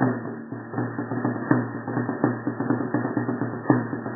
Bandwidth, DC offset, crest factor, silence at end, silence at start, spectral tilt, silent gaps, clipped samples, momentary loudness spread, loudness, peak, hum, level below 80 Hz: 2 kHz; under 0.1%; 22 dB; 0 s; 0 s; -13.5 dB/octave; none; under 0.1%; 7 LU; -26 LUFS; -2 dBFS; none; -66 dBFS